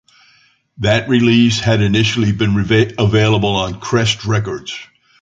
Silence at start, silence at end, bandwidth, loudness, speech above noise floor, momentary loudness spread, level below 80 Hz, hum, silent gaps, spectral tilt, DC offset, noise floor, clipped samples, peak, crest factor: 0.8 s; 0.4 s; 7.8 kHz; -14 LUFS; 39 dB; 8 LU; -38 dBFS; none; none; -5.5 dB/octave; under 0.1%; -53 dBFS; under 0.1%; -2 dBFS; 14 dB